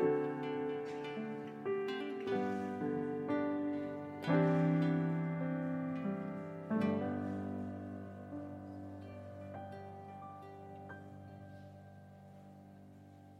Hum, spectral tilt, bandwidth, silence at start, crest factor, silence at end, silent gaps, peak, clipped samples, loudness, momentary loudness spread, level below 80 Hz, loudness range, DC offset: none; -9 dB/octave; 7.4 kHz; 0 s; 18 dB; 0 s; none; -20 dBFS; under 0.1%; -38 LUFS; 22 LU; -80 dBFS; 16 LU; under 0.1%